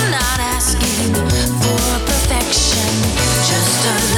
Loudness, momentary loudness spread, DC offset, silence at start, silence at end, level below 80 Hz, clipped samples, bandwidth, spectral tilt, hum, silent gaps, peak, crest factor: -15 LUFS; 3 LU; under 0.1%; 0 s; 0 s; -24 dBFS; under 0.1%; 19.5 kHz; -3 dB/octave; none; none; -6 dBFS; 10 dB